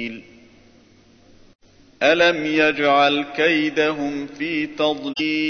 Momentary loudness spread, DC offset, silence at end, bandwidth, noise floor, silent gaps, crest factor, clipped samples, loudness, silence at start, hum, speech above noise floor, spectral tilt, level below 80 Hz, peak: 11 LU; under 0.1%; 0 s; 6.6 kHz; -52 dBFS; 1.55-1.59 s; 18 dB; under 0.1%; -19 LUFS; 0 s; none; 33 dB; -4.5 dB/octave; -58 dBFS; -4 dBFS